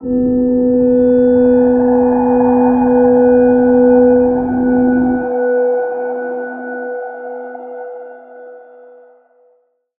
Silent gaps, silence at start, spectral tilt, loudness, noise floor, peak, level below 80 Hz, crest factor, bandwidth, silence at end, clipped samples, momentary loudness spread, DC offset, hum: none; 0 s; -13 dB/octave; -12 LUFS; -57 dBFS; -2 dBFS; -42 dBFS; 12 dB; 2.6 kHz; 1.4 s; under 0.1%; 17 LU; under 0.1%; none